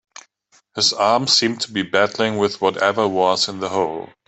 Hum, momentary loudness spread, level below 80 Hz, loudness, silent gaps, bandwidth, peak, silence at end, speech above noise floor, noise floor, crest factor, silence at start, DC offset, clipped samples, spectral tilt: none; 7 LU; -64 dBFS; -18 LUFS; none; 8.4 kHz; -2 dBFS; 0.2 s; 40 dB; -59 dBFS; 18 dB; 0.75 s; under 0.1%; under 0.1%; -3 dB/octave